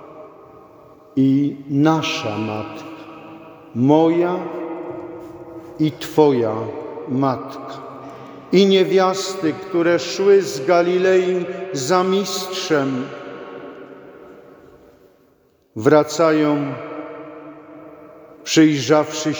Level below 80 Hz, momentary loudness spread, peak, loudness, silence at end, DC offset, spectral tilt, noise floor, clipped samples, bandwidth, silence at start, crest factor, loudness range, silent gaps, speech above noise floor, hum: -64 dBFS; 22 LU; 0 dBFS; -18 LUFS; 0 s; under 0.1%; -5.5 dB/octave; -57 dBFS; under 0.1%; over 20 kHz; 0 s; 18 dB; 5 LU; none; 40 dB; none